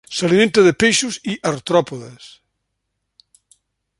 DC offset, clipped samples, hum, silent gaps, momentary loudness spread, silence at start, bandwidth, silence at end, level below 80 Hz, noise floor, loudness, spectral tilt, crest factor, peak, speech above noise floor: under 0.1%; under 0.1%; none; none; 17 LU; 0.1 s; 11.5 kHz; 1.7 s; -54 dBFS; -75 dBFS; -16 LUFS; -4 dB/octave; 18 dB; -2 dBFS; 58 dB